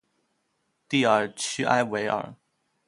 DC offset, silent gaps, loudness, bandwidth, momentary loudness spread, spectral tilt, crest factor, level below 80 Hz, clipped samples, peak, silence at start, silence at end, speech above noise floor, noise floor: under 0.1%; none; -25 LUFS; 11.5 kHz; 8 LU; -4 dB/octave; 22 dB; -70 dBFS; under 0.1%; -6 dBFS; 0.9 s; 0.55 s; 50 dB; -74 dBFS